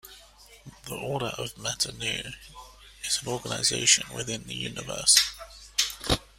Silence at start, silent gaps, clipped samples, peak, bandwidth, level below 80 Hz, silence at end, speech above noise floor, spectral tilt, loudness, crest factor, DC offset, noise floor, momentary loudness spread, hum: 0.05 s; none; under 0.1%; -4 dBFS; 16 kHz; -50 dBFS; 0.15 s; 25 dB; -1 dB/octave; -26 LUFS; 26 dB; under 0.1%; -53 dBFS; 18 LU; none